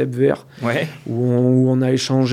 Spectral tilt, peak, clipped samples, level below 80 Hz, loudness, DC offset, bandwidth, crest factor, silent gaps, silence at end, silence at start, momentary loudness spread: -6.5 dB/octave; -4 dBFS; under 0.1%; -60 dBFS; -18 LUFS; under 0.1%; 11.5 kHz; 14 dB; none; 0 s; 0 s; 8 LU